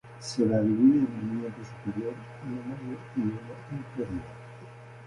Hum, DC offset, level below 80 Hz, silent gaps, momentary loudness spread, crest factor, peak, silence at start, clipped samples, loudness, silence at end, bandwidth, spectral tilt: none; under 0.1%; -60 dBFS; none; 21 LU; 18 dB; -12 dBFS; 0.05 s; under 0.1%; -29 LUFS; 0 s; 11.5 kHz; -7 dB/octave